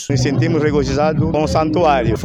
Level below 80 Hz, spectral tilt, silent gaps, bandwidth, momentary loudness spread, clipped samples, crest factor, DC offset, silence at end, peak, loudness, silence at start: -32 dBFS; -6.5 dB/octave; none; 11 kHz; 2 LU; under 0.1%; 12 dB; under 0.1%; 0 s; -4 dBFS; -16 LUFS; 0 s